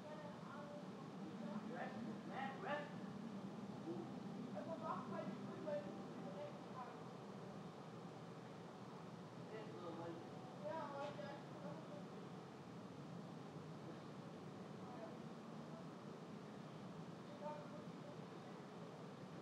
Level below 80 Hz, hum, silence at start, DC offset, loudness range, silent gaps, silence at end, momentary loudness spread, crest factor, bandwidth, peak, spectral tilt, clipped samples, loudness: -90 dBFS; none; 0 s; under 0.1%; 5 LU; none; 0 s; 7 LU; 20 dB; 12.5 kHz; -32 dBFS; -6.5 dB/octave; under 0.1%; -52 LUFS